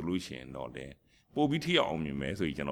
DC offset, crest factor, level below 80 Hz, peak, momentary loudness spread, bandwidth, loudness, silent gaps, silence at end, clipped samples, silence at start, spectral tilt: under 0.1%; 22 dB; -56 dBFS; -12 dBFS; 15 LU; 14.5 kHz; -33 LUFS; none; 0 s; under 0.1%; 0 s; -5.5 dB/octave